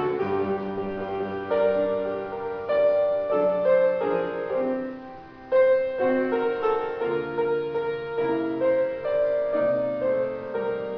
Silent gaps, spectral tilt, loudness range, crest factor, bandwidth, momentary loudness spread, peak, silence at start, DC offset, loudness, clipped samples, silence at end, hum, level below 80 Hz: none; -8.5 dB/octave; 2 LU; 14 dB; 5.4 kHz; 9 LU; -10 dBFS; 0 s; under 0.1%; -25 LUFS; under 0.1%; 0 s; none; -60 dBFS